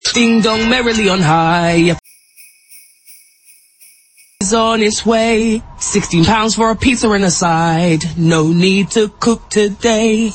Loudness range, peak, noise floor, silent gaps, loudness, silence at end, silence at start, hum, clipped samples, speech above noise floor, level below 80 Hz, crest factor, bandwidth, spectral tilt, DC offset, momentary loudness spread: 6 LU; 0 dBFS; -48 dBFS; none; -13 LUFS; 0 s; 0.05 s; none; under 0.1%; 36 dB; -38 dBFS; 14 dB; 17 kHz; -4.5 dB/octave; under 0.1%; 4 LU